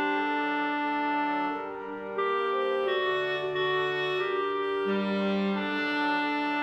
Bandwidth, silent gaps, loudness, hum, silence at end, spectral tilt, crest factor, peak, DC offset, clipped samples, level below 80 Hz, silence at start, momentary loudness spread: 8.2 kHz; none; -28 LUFS; none; 0 s; -6.5 dB/octave; 12 dB; -18 dBFS; under 0.1%; under 0.1%; -70 dBFS; 0 s; 3 LU